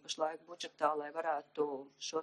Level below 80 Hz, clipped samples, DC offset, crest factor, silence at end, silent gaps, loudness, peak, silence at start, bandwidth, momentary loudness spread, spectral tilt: under -90 dBFS; under 0.1%; under 0.1%; 20 dB; 0 s; none; -38 LUFS; -18 dBFS; 0.05 s; 10.5 kHz; 8 LU; -2 dB/octave